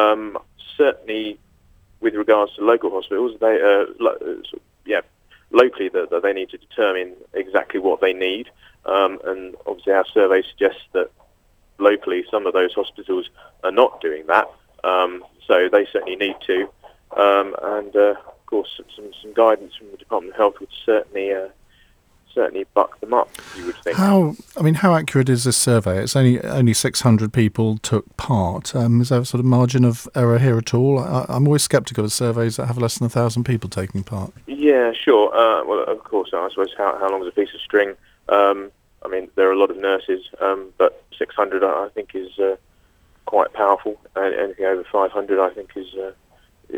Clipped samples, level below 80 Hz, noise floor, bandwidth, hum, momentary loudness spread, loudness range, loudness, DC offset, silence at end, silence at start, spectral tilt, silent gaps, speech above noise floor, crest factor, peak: under 0.1%; -54 dBFS; -57 dBFS; over 20 kHz; none; 13 LU; 4 LU; -19 LUFS; under 0.1%; 0 s; 0 s; -5.5 dB/octave; none; 38 dB; 20 dB; 0 dBFS